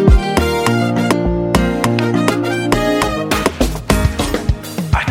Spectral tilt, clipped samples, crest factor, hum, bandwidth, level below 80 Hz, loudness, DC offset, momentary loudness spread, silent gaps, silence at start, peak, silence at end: -5.5 dB/octave; under 0.1%; 14 dB; none; 17 kHz; -22 dBFS; -16 LUFS; under 0.1%; 4 LU; none; 0 s; 0 dBFS; 0 s